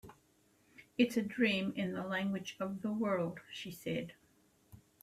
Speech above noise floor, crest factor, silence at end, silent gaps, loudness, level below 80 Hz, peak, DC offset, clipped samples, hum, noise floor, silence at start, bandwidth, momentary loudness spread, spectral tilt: 35 dB; 22 dB; 0.25 s; none; -37 LUFS; -74 dBFS; -16 dBFS; under 0.1%; under 0.1%; none; -71 dBFS; 0.05 s; 15 kHz; 12 LU; -5.5 dB/octave